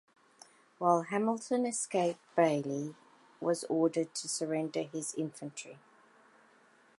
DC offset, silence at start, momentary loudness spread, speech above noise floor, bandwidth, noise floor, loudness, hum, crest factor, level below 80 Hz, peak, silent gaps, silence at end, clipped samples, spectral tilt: under 0.1%; 0.8 s; 10 LU; 32 dB; 11.5 kHz; -64 dBFS; -33 LUFS; none; 22 dB; -88 dBFS; -12 dBFS; none; 1.2 s; under 0.1%; -4.5 dB/octave